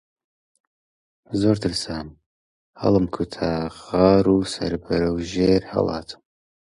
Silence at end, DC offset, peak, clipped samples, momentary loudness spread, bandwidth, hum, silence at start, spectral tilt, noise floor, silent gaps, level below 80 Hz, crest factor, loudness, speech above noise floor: 0.6 s; under 0.1%; -2 dBFS; under 0.1%; 14 LU; 11.5 kHz; none; 1.3 s; -6.5 dB/octave; under -90 dBFS; 2.26-2.74 s; -44 dBFS; 20 dB; -22 LUFS; over 69 dB